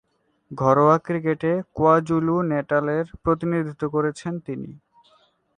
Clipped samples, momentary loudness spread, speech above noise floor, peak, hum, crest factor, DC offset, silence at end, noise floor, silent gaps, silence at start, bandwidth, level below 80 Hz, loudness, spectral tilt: under 0.1%; 14 LU; 39 dB; -4 dBFS; none; 20 dB; under 0.1%; 0.8 s; -61 dBFS; none; 0.5 s; 9.8 kHz; -52 dBFS; -22 LUFS; -8.5 dB/octave